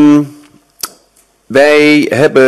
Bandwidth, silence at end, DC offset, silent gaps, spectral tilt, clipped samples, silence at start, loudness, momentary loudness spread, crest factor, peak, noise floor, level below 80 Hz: 14 kHz; 0 s; under 0.1%; none; -5 dB/octave; under 0.1%; 0 s; -8 LUFS; 17 LU; 10 dB; 0 dBFS; -51 dBFS; -52 dBFS